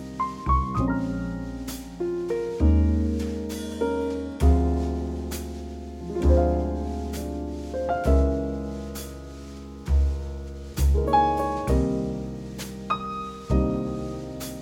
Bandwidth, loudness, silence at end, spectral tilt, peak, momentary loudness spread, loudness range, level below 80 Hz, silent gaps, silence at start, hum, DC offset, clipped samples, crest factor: 16.5 kHz; -26 LUFS; 0 s; -7.5 dB/octave; -8 dBFS; 14 LU; 3 LU; -28 dBFS; none; 0 s; none; under 0.1%; under 0.1%; 18 dB